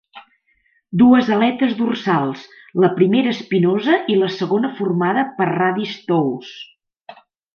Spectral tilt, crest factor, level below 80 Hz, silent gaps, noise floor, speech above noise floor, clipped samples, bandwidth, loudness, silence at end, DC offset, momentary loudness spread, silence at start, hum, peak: -7.5 dB/octave; 16 dB; -62 dBFS; none; -62 dBFS; 45 dB; under 0.1%; 6.8 kHz; -17 LUFS; 0.45 s; under 0.1%; 12 LU; 0.15 s; none; -2 dBFS